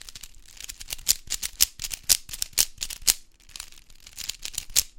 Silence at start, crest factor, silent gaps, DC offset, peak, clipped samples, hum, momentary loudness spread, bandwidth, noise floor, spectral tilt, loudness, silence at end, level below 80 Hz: 0 s; 30 dB; none; under 0.1%; 0 dBFS; under 0.1%; none; 20 LU; 17 kHz; -47 dBFS; 2 dB/octave; -25 LUFS; 0.1 s; -46 dBFS